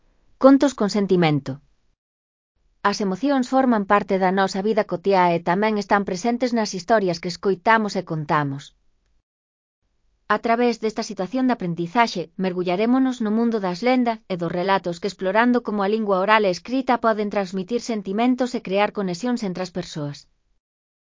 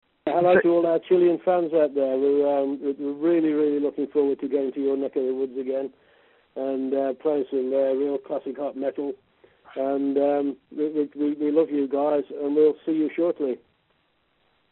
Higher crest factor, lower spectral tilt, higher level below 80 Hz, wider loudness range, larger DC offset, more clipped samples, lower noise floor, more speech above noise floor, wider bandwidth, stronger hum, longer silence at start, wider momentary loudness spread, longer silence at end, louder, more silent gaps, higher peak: about the same, 22 dB vs 18 dB; about the same, -6 dB/octave vs -5.5 dB/octave; first, -60 dBFS vs -72 dBFS; about the same, 5 LU vs 5 LU; neither; neither; first, under -90 dBFS vs -68 dBFS; first, over 69 dB vs 45 dB; first, 7.6 kHz vs 4.2 kHz; neither; first, 0.4 s vs 0.25 s; about the same, 8 LU vs 9 LU; second, 1 s vs 1.15 s; first, -21 LUFS vs -24 LUFS; first, 1.98-2.55 s, 9.23-9.82 s vs none; first, 0 dBFS vs -6 dBFS